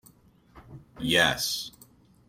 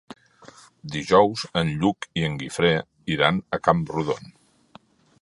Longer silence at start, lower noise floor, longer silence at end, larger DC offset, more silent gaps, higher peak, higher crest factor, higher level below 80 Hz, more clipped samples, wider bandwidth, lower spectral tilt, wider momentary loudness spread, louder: first, 0.55 s vs 0.1 s; first, -58 dBFS vs -53 dBFS; second, 0.6 s vs 1 s; neither; neither; second, -8 dBFS vs 0 dBFS; about the same, 22 dB vs 24 dB; about the same, -56 dBFS vs -52 dBFS; neither; first, 16 kHz vs 11.5 kHz; second, -2.5 dB/octave vs -5.5 dB/octave; about the same, 14 LU vs 12 LU; about the same, -25 LUFS vs -23 LUFS